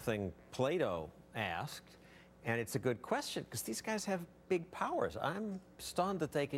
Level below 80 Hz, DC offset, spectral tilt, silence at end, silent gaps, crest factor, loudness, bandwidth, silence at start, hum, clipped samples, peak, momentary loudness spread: -66 dBFS; under 0.1%; -4.5 dB/octave; 0 s; none; 20 dB; -39 LUFS; 16.5 kHz; 0 s; none; under 0.1%; -18 dBFS; 9 LU